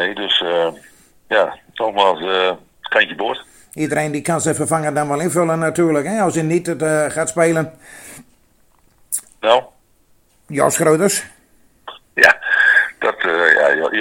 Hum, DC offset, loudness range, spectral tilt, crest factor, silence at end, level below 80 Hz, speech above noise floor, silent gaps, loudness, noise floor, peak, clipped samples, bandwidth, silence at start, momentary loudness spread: none; under 0.1%; 6 LU; -3.5 dB/octave; 18 dB; 0 s; -58 dBFS; 39 dB; none; -16 LUFS; -56 dBFS; 0 dBFS; under 0.1%; 17 kHz; 0 s; 13 LU